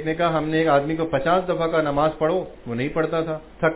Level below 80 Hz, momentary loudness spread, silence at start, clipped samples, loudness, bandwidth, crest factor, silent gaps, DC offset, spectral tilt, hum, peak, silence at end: -46 dBFS; 7 LU; 0 s; under 0.1%; -22 LUFS; 4 kHz; 14 dB; none; under 0.1%; -10.5 dB/octave; none; -6 dBFS; 0 s